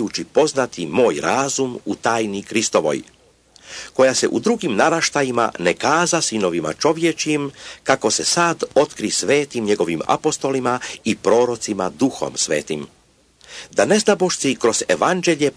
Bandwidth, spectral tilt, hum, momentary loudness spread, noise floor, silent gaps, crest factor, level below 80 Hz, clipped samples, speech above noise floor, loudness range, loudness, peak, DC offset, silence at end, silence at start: 11 kHz; -3.5 dB/octave; none; 7 LU; -53 dBFS; none; 18 dB; -58 dBFS; under 0.1%; 34 dB; 2 LU; -19 LUFS; -2 dBFS; under 0.1%; 0.05 s; 0 s